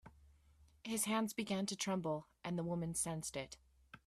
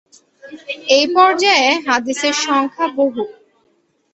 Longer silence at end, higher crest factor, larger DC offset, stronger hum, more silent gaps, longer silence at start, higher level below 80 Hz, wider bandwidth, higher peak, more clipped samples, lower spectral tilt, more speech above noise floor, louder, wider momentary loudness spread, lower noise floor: second, 0.1 s vs 0.8 s; about the same, 18 dB vs 16 dB; neither; neither; neither; second, 0.05 s vs 0.45 s; about the same, -70 dBFS vs -66 dBFS; first, 15.5 kHz vs 8.2 kHz; second, -24 dBFS vs 0 dBFS; neither; first, -4 dB/octave vs -1 dB/octave; second, 28 dB vs 47 dB; second, -40 LUFS vs -14 LUFS; second, 10 LU vs 15 LU; first, -68 dBFS vs -61 dBFS